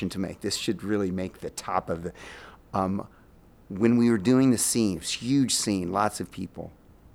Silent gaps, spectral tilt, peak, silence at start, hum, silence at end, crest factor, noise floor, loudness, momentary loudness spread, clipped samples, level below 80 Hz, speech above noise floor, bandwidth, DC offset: none; -4.5 dB/octave; -8 dBFS; 0 s; none; 0.45 s; 18 dB; -54 dBFS; -26 LUFS; 17 LU; under 0.1%; -56 dBFS; 28 dB; 16.5 kHz; under 0.1%